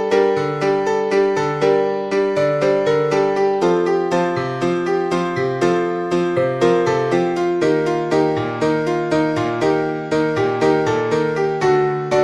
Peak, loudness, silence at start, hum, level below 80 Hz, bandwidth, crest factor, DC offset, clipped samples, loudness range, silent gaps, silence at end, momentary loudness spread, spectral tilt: -2 dBFS; -18 LUFS; 0 s; none; -54 dBFS; 10.5 kHz; 14 dB; under 0.1%; under 0.1%; 1 LU; none; 0 s; 3 LU; -6.5 dB/octave